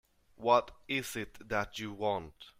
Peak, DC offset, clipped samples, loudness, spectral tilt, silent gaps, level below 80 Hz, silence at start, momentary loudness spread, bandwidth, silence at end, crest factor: -12 dBFS; under 0.1%; under 0.1%; -34 LUFS; -4 dB/octave; none; -60 dBFS; 0.4 s; 11 LU; 16 kHz; 0.1 s; 22 dB